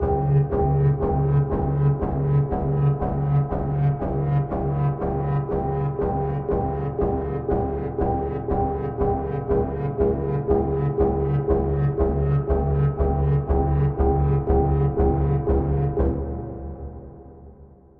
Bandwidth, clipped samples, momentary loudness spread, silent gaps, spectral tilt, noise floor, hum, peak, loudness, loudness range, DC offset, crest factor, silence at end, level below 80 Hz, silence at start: 3 kHz; under 0.1%; 5 LU; none; -13 dB/octave; -47 dBFS; none; -6 dBFS; -23 LUFS; 3 LU; under 0.1%; 16 dB; 0.35 s; -30 dBFS; 0 s